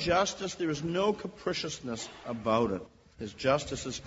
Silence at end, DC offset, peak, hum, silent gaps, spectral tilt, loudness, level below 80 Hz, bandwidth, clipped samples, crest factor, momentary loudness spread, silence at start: 0 s; under 0.1%; -12 dBFS; none; none; -4.5 dB/octave; -32 LUFS; -56 dBFS; 8 kHz; under 0.1%; 18 dB; 10 LU; 0 s